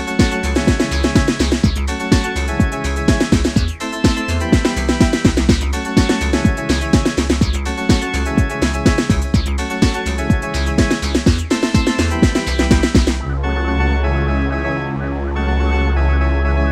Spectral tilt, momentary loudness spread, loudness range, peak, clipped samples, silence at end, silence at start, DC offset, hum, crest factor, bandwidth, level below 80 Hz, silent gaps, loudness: -5.5 dB/octave; 4 LU; 2 LU; 0 dBFS; under 0.1%; 0 s; 0 s; under 0.1%; none; 16 dB; 14 kHz; -20 dBFS; none; -17 LUFS